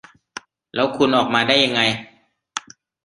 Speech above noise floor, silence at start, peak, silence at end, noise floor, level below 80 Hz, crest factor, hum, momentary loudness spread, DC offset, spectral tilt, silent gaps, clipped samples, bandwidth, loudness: 22 dB; 0.75 s; -2 dBFS; 0.45 s; -40 dBFS; -60 dBFS; 20 dB; none; 22 LU; under 0.1%; -3.5 dB/octave; none; under 0.1%; 11 kHz; -18 LUFS